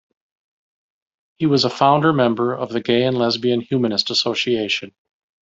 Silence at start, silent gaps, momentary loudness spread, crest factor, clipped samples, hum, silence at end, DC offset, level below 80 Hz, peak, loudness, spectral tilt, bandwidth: 1.4 s; none; 7 LU; 18 dB; under 0.1%; none; 0.55 s; under 0.1%; -60 dBFS; -2 dBFS; -18 LUFS; -5.5 dB/octave; 7.8 kHz